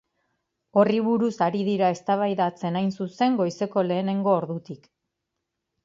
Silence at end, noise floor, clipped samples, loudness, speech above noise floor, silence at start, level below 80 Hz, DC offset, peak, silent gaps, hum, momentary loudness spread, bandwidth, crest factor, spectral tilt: 1.1 s; -82 dBFS; under 0.1%; -24 LUFS; 58 dB; 0.75 s; -72 dBFS; under 0.1%; -6 dBFS; none; none; 7 LU; 7.6 kHz; 20 dB; -7 dB/octave